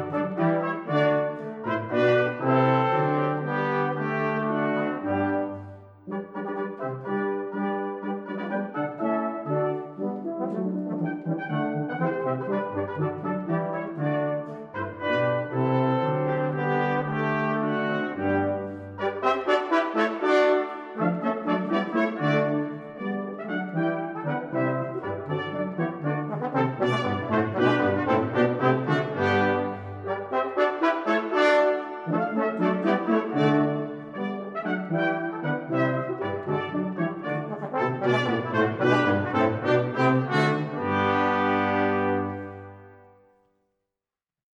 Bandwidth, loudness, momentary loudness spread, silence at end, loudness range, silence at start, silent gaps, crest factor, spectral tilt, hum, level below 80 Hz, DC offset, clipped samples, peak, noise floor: 9 kHz; -26 LUFS; 9 LU; 1.55 s; 5 LU; 0 s; none; 18 dB; -8 dB/octave; none; -72 dBFS; under 0.1%; under 0.1%; -8 dBFS; under -90 dBFS